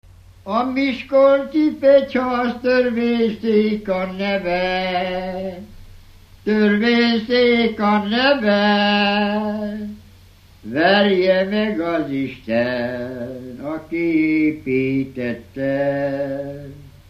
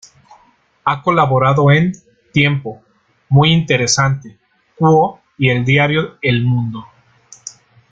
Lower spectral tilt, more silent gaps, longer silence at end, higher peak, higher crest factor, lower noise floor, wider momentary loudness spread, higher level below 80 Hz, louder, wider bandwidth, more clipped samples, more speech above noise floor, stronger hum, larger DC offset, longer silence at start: first, -7 dB/octave vs -5 dB/octave; neither; second, 0.2 s vs 0.4 s; about the same, -2 dBFS vs -2 dBFS; about the same, 16 dB vs 14 dB; second, -47 dBFS vs -54 dBFS; second, 14 LU vs 19 LU; about the same, -48 dBFS vs -48 dBFS; second, -18 LUFS vs -14 LUFS; second, 6.8 kHz vs 8.8 kHz; neither; second, 29 dB vs 40 dB; neither; neither; second, 0.45 s vs 0.85 s